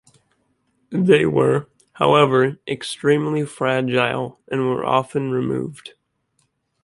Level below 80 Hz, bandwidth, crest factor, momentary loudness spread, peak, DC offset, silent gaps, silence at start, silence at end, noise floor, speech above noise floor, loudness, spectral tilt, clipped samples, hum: -58 dBFS; 11.5 kHz; 20 dB; 12 LU; 0 dBFS; under 0.1%; none; 0.9 s; 0.95 s; -68 dBFS; 49 dB; -19 LUFS; -6.5 dB/octave; under 0.1%; none